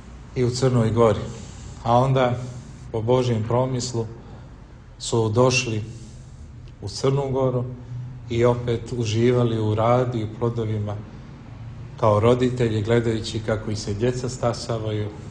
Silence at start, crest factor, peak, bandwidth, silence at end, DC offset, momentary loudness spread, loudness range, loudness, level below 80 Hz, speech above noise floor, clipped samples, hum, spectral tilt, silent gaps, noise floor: 0 s; 20 dB; -4 dBFS; 9.8 kHz; 0 s; under 0.1%; 20 LU; 3 LU; -22 LUFS; -44 dBFS; 21 dB; under 0.1%; none; -6.5 dB/octave; none; -43 dBFS